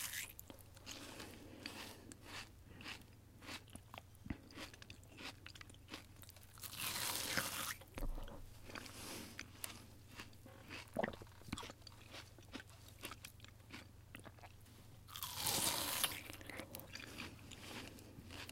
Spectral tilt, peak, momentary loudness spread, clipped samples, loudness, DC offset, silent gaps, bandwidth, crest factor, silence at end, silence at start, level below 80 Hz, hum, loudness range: -2 dB/octave; -20 dBFS; 18 LU; under 0.1%; -47 LUFS; under 0.1%; none; 16.5 kHz; 30 dB; 0 s; 0 s; -60 dBFS; none; 11 LU